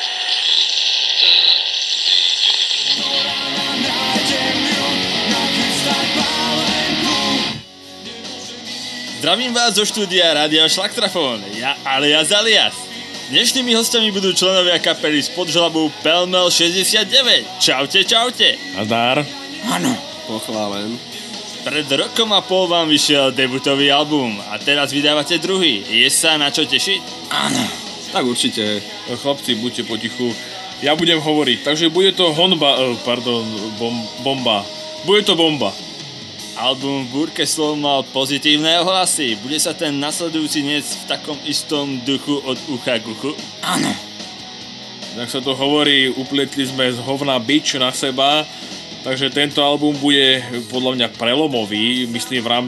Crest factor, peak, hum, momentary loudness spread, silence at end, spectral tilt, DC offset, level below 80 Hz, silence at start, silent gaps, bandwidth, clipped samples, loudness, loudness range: 16 dB; 0 dBFS; none; 13 LU; 0 s; -2.5 dB/octave; under 0.1%; -60 dBFS; 0 s; none; 15 kHz; under 0.1%; -15 LUFS; 6 LU